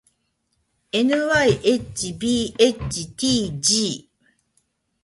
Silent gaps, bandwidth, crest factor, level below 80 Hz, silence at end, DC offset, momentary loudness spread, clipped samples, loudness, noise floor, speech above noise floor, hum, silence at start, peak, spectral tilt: none; 11.5 kHz; 20 dB; -48 dBFS; 1.05 s; under 0.1%; 10 LU; under 0.1%; -20 LUFS; -71 dBFS; 50 dB; none; 0.95 s; -2 dBFS; -3.5 dB/octave